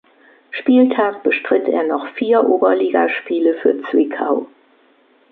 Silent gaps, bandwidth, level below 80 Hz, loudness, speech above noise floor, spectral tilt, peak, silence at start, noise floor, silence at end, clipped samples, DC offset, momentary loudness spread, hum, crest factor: none; 4.4 kHz; -70 dBFS; -16 LUFS; 38 dB; -8.5 dB/octave; -2 dBFS; 0.5 s; -54 dBFS; 0.85 s; under 0.1%; under 0.1%; 8 LU; none; 14 dB